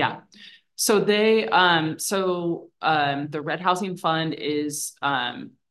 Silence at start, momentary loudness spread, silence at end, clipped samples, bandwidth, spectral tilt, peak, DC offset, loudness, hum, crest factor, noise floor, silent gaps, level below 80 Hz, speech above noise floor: 0 s; 10 LU; 0.2 s; under 0.1%; 13 kHz; -3.5 dB/octave; -4 dBFS; under 0.1%; -23 LUFS; none; 18 dB; -49 dBFS; none; -74 dBFS; 26 dB